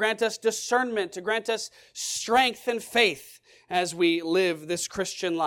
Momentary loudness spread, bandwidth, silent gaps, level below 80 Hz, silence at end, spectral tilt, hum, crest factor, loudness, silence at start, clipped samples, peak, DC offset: 8 LU; 18 kHz; none; -66 dBFS; 0 s; -2.5 dB/octave; none; 18 dB; -26 LUFS; 0 s; under 0.1%; -8 dBFS; under 0.1%